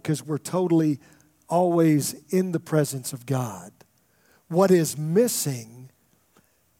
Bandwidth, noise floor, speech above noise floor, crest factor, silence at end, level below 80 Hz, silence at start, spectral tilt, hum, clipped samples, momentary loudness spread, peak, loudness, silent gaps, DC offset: 16.5 kHz; -63 dBFS; 40 dB; 20 dB; 0.95 s; -72 dBFS; 0.05 s; -6 dB/octave; none; under 0.1%; 13 LU; -6 dBFS; -24 LUFS; none; under 0.1%